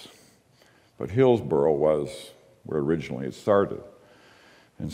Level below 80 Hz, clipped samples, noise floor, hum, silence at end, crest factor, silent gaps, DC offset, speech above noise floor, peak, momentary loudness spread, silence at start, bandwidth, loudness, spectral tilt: -58 dBFS; under 0.1%; -59 dBFS; none; 0 s; 18 dB; none; under 0.1%; 35 dB; -8 dBFS; 17 LU; 0 s; 12.5 kHz; -25 LUFS; -7.5 dB/octave